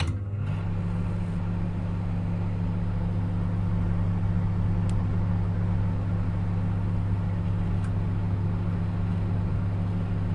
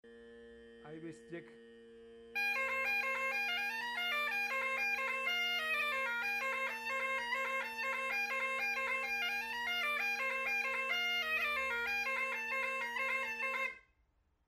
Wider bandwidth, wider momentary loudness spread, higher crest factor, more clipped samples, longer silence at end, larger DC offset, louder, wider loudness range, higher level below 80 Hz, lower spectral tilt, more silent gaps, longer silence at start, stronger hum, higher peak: second, 5.2 kHz vs 16 kHz; about the same, 3 LU vs 4 LU; about the same, 12 dB vs 12 dB; neither; second, 0 s vs 0.65 s; neither; first, -28 LUFS vs -35 LUFS; about the same, 2 LU vs 2 LU; first, -34 dBFS vs -74 dBFS; first, -9.5 dB/octave vs -1 dB/octave; neither; about the same, 0 s vs 0.05 s; neither; first, -14 dBFS vs -26 dBFS